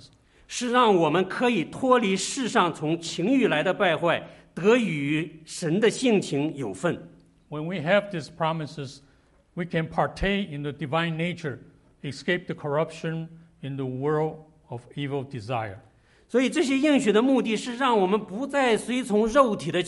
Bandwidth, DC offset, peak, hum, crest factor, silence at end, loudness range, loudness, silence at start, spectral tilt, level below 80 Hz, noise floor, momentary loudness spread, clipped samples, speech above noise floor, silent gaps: 11.5 kHz; under 0.1%; -4 dBFS; none; 20 dB; 0 s; 7 LU; -25 LUFS; 0.05 s; -5 dB/octave; -52 dBFS; -60 dBFS; 14 LU; under 0.1%; 36 dB; none